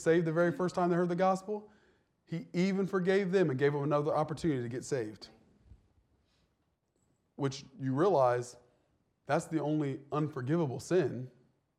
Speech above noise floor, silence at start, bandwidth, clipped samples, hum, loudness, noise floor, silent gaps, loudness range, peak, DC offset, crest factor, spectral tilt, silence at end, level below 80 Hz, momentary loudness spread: 47 dB; 0 s; 12 kHz; under 0.1%; none; -32 LUFS; -78 dBFS; none; 7 LU; -16 dBFS; under 0.1%; 16 dB; -7 dB/octave; 0.5 s; -70 dBFS; 12 LU